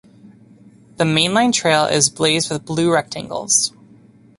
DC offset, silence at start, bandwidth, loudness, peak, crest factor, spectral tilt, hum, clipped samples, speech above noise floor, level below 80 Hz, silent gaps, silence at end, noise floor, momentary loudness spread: under 0.1%; 1 s; 11.5 kHz; -17 LUFS; 0 dBFS; 18 dB; -3 dB/octave; none; under 0.1%; 30 dB; -56 dBFS; none; 0.7 s; -48 dBFS; 7 LU